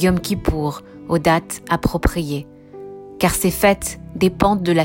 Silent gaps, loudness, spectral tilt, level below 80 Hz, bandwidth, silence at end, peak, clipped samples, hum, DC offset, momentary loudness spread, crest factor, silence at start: none; -19 LUFS; -5 dB/octave; -32 dBFS; 16.5 kHz; 0 s; -2 dBFS; under 0.1%; none; under 0.1%; 19 LU; 18 dB; 0 s